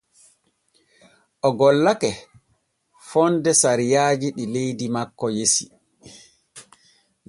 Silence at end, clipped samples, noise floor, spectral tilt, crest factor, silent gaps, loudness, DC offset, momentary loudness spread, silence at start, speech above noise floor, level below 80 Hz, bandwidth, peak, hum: 0.65 s; under 0.1%; -68 dBFS; -3.5 dB/octave; 20 dB; none; -20 LUFS; under 0.1%; 10 LU; 1.45 s; 48 dB; -62 dBFS; 11.5 kHz; -4 dBFS; none